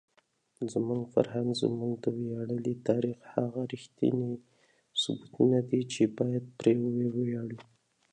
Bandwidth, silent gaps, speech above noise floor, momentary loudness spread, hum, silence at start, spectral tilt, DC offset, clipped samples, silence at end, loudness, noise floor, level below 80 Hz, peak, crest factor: 10.5 kHz; none; 40 dB; 10 LU; none; 0.6 s; -6.5 dB/octave; under 0.1%; under 0.1%; 0.5 s; -31 LUFS; -70 dBFS; -72 dBFS; -10 dBFS; 22 dB